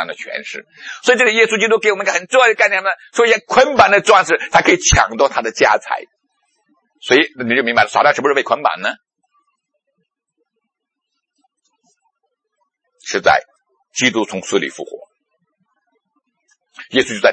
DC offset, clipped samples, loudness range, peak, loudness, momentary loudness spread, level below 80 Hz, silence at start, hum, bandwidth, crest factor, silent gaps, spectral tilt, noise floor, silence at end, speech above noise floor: under 0.1%; under 0.1%; 10 LU; 0 dBFS; -14 LUFS; 14 LU; -40 dBFS; 0 s; none; 8.8 kHz; 16 dB; none; -2.5 dB/octave; -77 dBFS; 0 s; 63 dB